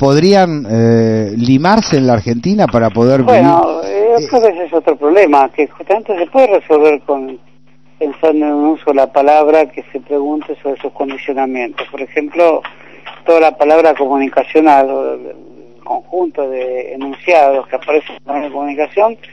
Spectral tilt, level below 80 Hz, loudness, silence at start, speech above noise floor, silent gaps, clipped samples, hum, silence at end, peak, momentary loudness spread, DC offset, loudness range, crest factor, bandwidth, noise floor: -7 dB/octave; -48 dBFS; -12 LUFS; 0 s; 37 dB; none; 0.8%; none; 0.15 s; 0 dBFS; 12 LU; 0.8%; 5 LU; 12 dB; 8.8 kHz; -49 dBFS